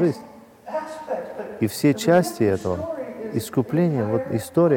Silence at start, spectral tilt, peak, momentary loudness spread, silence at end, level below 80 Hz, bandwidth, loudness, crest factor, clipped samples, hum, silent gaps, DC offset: 0 s; -6.5 dB/octave; -6 dBFS; 13 LU; 0 s; -58 dBFS; 18 kHz; -23 LUFS; 16 dB; under 0.1%; none; none; under 0.1%